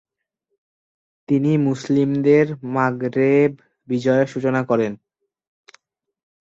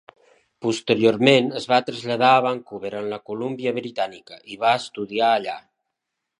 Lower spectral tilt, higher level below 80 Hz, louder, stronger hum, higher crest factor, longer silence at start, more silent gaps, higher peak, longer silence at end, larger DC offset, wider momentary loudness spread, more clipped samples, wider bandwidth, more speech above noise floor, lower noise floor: first, -8 dB/octave vs -5 dB/octave; first, -64 dBFS vs -70 dBFS; about the same, -19 LUFS vs -21 LUFS; neither; second, 16 dB vs 22 dB; first, 1.3 s vs 0.6 s; neither; about the same, -4 dBFS vs -2 dBFS; first, 1.55 s vs 0.8 s; neither; second, 6 LU vs 13 LU; neither; second, 7.8 kHz vs 11 kHz; about the same, 58 dB vs 60 dB; second, -76 dBFS vs -81 dBFS